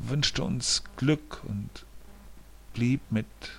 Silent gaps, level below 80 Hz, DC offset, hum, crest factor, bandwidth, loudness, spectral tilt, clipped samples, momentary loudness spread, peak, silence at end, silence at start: none; -48 dBFS; under 0.1%; none; 20 dB; 16 kHz; -29 LUFS; -4 dB/octave; under 0.1%; 13 LU; -10 dBFS; 0 s; 0 s